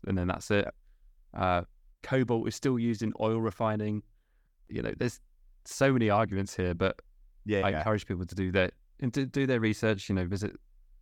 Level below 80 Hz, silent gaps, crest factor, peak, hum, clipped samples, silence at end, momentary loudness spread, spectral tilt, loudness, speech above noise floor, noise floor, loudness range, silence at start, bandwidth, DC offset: -54 dBFS; none; 18 dB; -12 dBFS; none; under 0.1%; 0.45 s; 10 LU; -6.5 dB/octave; -30 LUFS; 37 dB; -66 dBFS; 2 LU; 0.05 s; 16 kHz; under 0.1%